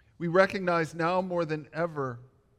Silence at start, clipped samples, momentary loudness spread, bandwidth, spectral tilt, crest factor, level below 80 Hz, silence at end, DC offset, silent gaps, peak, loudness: 0.2 s; under 0.1%; 11 LU; 12 kHz; -6.5 dB/octave; 20 dB; -66 dBFS; 0.35 s; under 0.1%; none; -10 dBFS; -28 LUFS